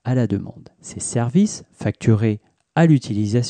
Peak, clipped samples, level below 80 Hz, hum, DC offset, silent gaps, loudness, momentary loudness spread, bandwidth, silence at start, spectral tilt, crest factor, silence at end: -4 dBFS; under 0.1%; -54 dBFS; none; under 0.1%; none; -20 LUFS; 14 LU; 10 kHz; 0.05 s; -6.5 dB/octave; 16 dB; 0 s